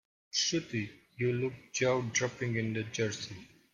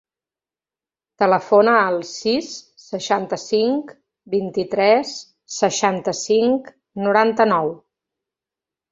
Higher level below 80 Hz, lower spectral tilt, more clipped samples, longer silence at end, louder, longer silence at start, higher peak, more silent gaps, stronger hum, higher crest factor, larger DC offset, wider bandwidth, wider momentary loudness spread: about the same, -68 dBFS vs -64 dBFS; about the same, -4 dB/octave vs -4 dB/octave; neither; second, 0.25 s vs 1.15 s; second, -33 LUFS vs -19 LUFS; second, 0.35 s vs 1.2 s; second, -16 dBFS vs -2 dBFS; neither; neither; about the same, 18 dB vs 18 dB; neither; first, 10 kHz vs 7.8 kHz; second, 10 LU vs 16 LU